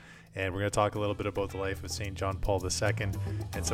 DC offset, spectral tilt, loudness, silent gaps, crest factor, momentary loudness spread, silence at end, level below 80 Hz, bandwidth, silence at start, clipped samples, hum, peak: under 0.1%; -4.5 dB/octave; -32 LUFS; none; 20 dB; 7 LU; 0 s; -44 dBFS; 16.5 kHz; 0 s; under 0.1%; none; -12 dBFS